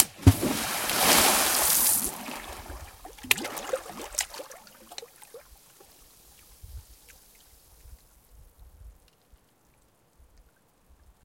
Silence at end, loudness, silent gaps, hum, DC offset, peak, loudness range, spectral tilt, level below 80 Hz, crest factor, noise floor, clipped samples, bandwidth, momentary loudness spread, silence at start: 2.35 s; -24 LUFS; none; none; under 0.1%; 0 dBFS; 25 LU; -2.5 dB/octave; -48 dBFS; 30 dB; -64 dBFS; under 0.1%; 17 kHz; 27 LU; 0 s